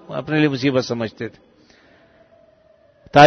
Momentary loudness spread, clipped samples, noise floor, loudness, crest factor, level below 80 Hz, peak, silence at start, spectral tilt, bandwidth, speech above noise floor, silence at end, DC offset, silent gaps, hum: 14 LU; under 0.1%; -54 dBFS; -21 LUFS; 20 dB; -54 dBFS; 0 dBFS; 0.1 s; -6 dB/octave; 7.8 kHz; 33 dB; 0 s; under 0.1%; none; none